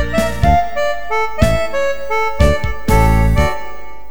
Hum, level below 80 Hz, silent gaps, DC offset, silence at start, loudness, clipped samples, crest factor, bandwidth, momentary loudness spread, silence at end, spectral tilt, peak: none; -20 dBFS; none; 10%; 0 s; -16 LUFS; under 0.1%; 16 dB; over 20 kHz; 6 LU; 0 s; -6 dB/octave; 0 dBFS